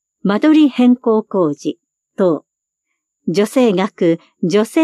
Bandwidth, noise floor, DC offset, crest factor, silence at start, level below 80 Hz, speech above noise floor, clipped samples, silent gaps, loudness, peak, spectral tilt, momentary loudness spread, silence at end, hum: 13.5 kHz; -75 dBFS; under 0.1%; 14 dB; 0.25 s; -72 dBFS; 62 dB; under 0.1%; none; -15 LUFS; -2 dBFS; -6.5 dB/octave; 13 LU; 0 s; none